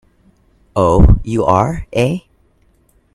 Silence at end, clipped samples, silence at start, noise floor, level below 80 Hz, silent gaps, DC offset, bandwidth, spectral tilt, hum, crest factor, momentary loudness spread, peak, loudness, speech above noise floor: 0.95 s; under 0.1%; 0.75 s; -55 dBFS; -20 dBFS; none; under 0.1%; 12 kHz; -8 dB/octave; none; 14 dB; 9 LU; 0 dBFS; -14 LUFS; 43 dB